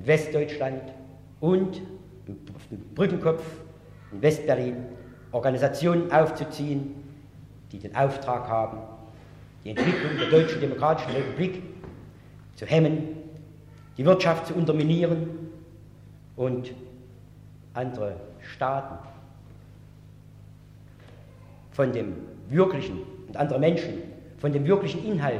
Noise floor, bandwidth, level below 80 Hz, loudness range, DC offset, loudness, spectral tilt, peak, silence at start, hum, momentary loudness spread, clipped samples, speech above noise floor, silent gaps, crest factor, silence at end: -49 dBFS; 13 kHz; -56 dBFS; 10 LU; under 0.1%; -26 LUFS; -7.5 dB/octave; -8 dBFS; 0 s; none; 21 LU; under 0.1%; 24 dB; none; 20 dB; 0 s